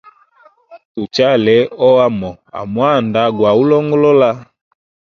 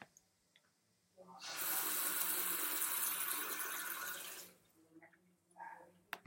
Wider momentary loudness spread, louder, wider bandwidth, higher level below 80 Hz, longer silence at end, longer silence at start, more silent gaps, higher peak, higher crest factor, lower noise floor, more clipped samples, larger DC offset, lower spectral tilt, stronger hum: second, 15 LU vs 19 LU; first, -13 LUFS vs -38 LUFS; second, 7.2 kHz vs 16.5 kHz; first, -52 dBFS vs under -90 dBFS; first, 0.7 s vs 0.1 s; first, 0.7 s vs 0 s; first, 0.85-0.95 s vs none; first, 0 dBFS vs -20 dBFS; second, 14 dB vs 24 dB; second, -49 dBFS vs -78 dBFS; neither; neither; first, -7 dB/octave vs 1 dB/octave; neither